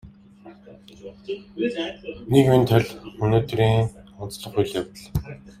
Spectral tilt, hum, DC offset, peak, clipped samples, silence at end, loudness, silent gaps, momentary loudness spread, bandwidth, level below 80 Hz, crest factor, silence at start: -7 dB/octave; none; under 0.1%; -4 dBFS; under 0.1%; 0.1 s; -22 LUFS; none; 20 LU; 15.5 kHz; -46 dBFS; 20 dB; 0.05 s